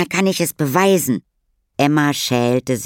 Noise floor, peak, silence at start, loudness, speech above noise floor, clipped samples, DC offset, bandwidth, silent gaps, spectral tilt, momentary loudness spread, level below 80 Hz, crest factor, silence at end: -66 dBFS; 0 dBFS; 0 s; -17 LUFS; 50 dB; under 0.1%; under 0.1%; 17 kHz; none; -4.5 dB/octave; 7 LU; -58 dBFS; 16 dB; 0 s